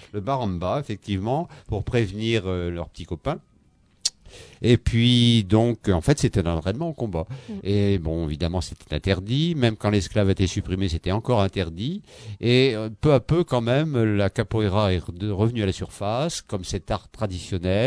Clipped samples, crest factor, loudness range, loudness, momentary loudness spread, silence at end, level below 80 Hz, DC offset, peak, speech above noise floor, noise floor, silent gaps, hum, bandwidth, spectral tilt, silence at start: under 0.1%; 20 dB; 5 LU; -24 LUFS; 11 LU; 0 s; -40 dBFS; under 0.1%; -4 dBFS; 36 dB; -59 dBFS; none; none; 11 kHz; -6 dB/octave; 0.15 s